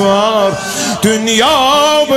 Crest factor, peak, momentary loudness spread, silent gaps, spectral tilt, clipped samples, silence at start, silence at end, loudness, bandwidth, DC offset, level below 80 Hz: 10 dB; 0 dBFS; 6 LU; none; -3 dB/octave; under 0.1%; 0 s; 0 s; -11 LUFS; 16.5 kHz; under 0.1%; -44 dBFS